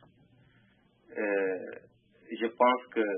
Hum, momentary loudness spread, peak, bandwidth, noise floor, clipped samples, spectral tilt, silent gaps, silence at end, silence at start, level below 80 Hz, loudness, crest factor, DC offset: none; 19 LU; -12 dBFS; 3.7 kHz; -65 dBFS; under 0.1%; -8 dB/octave; none; 0 s; 1.1 s; -80 dBFS; -30 LUFS; 22 dB; under 0.1%